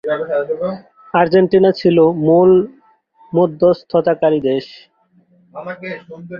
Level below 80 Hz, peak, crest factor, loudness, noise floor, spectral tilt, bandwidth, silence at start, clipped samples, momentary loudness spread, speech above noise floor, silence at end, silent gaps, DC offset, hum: -56 dBFS; -2 dBFS; 14 dB; -14 LUFS; -54 dBFS; -9 dB/octave; 5.8 kHz; 0.05 s; under 0.1%; 17 LU; 40 dB; 0 s; none; under 0.1%; none